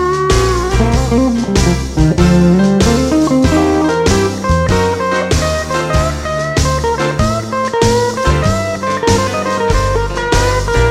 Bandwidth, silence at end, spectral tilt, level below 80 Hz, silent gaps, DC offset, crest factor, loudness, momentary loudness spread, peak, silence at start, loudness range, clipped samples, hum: 16 kHz; 0 s; -5.5 dB/octave; -20 dBFS; none; under 0.1%; 12 dB; -13 LUFS; 5 LU; 0 dBFS; 0 s; 3 LU; under 0.1%; none